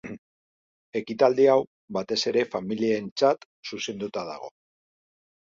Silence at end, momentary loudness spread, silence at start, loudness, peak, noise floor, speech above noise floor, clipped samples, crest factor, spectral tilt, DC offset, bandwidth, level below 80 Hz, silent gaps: 0.9 s; 17 LU; 0.05 s; -25 LUFS; -6 dBFS; under -90 dBFS; over 65 dB; under 0.1%; 20 dB; -4.5 dB/octave; under 0.1%; 7.6 kHz; -70 dBFS; 0.18-0.93 s, 1.67-1.88 s, 3.12-3.16 s, 3.46-3.63 s